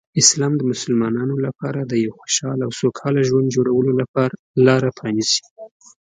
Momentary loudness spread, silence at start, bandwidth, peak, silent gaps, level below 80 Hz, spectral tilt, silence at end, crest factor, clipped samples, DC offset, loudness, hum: 8 LU; 0.15 s; 9.6 kHz; 0 dBFS; 4.08-4.14 s, 4.39-4.54 s, 5.51-5.56 s; -60 dBFS; -4.5 dB/octave; 0.45 s; 18 dB; under 0.1%; under 0.1%; -19 LUFS; none